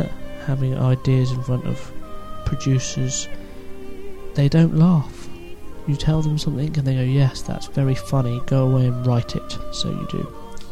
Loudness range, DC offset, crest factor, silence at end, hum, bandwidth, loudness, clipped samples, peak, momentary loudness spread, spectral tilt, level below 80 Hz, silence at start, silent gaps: 3 LU; under 0.1%; 18 dB; 0 s; none; 11.5 kHz; -21 LUFS; under 0.1%; -4 dBFS; 21 LU; -6.5 dB/octave; -36 dBFS; 0 s; none